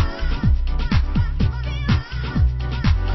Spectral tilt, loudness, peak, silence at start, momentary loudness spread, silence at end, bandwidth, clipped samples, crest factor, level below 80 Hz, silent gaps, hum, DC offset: -7.5 dB/octave; -22 LUFS; -6 dBFS; 0 s; 2 LU; 0 s; 6 kHz; under 0.1%; 12 dB; -20 dBFS; none; none; under 0.1%